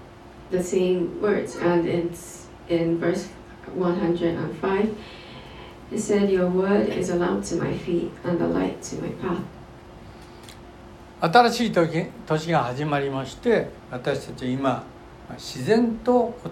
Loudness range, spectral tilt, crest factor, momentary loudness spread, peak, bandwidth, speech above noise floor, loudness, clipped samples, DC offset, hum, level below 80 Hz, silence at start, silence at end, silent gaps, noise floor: 4 LU; -6 dB/octave; 20 dB; 22 LU; -4 dBFS; 15 kHz; 21 dB; -24 LUFS; under 0.1%; under 0.1%; none; -50 dBFS; 0 s; 0 s; none; -44 dBFS